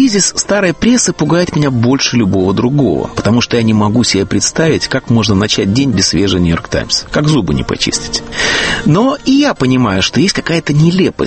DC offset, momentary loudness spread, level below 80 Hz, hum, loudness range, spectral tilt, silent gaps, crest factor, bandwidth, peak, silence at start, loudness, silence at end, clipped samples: under 0.1%; 3 LU; -34 dBFS; none; 1 LU; -4.5 dB/octave; none; 12 dB; 8.8 kHz; 0 dBFS; 0 s; -11 LUFS; 0 s; under 0.1%